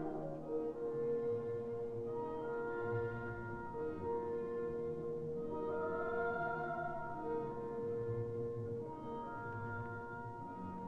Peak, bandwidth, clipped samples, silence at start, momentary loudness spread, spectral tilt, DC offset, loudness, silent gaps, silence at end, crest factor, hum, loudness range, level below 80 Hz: -28 dBFS; 5.6 kHz; under 0.1%; 0 s; 7 LU; -9.5 dB/octave; under 0.1%; -42 LUFS; none; 0 s; 14 dB; none; 2 LU; -64 dBFS